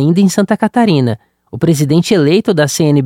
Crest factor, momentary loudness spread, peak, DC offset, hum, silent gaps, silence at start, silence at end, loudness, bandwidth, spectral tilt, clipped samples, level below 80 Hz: 10 dB; 7 LU; 0 dBFS; under 0.1%; none; none; 0 s; 0 s; -12 LUFS; 16.5 kHz; -6 dB/octave; under 0.1%; -50 dBFS